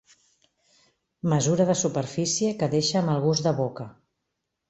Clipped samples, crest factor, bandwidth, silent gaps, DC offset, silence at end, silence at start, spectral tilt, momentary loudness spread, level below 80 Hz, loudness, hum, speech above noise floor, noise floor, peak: under 0.1%; 18 dB; 8.4 kHz; none; under 0.1%; 0.8 s; 1.25 s; -5 dB/octave; 9 LU; -62 dBFS; -24 LUFS; none; 57 dB; -81 dBFS; -8 dBFS